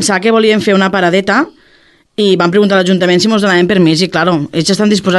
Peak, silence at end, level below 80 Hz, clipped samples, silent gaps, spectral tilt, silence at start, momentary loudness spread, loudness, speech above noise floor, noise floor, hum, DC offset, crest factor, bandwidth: 0 dBFS; 0 s; -52 dBFS; under 0.1%; none; -5 dB/octave; 0 s; 4 LU; -10 LUFS; 38 dB; -48 dBFS; none; under 0.1%; 10 dB; 12.5 kHz